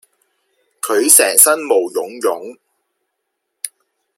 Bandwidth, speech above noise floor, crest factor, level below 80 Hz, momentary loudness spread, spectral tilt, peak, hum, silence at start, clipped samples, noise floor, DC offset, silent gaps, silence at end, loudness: 16.5 kHz; 61 dB; 18 dB; -70 dBFS; 20 LU; 0.5 dB/octave; 0 dBFS; none; 0.85 s; 0.2%; -74 dBFS; under 0.1%; none; 0.5 s; -12 LUFS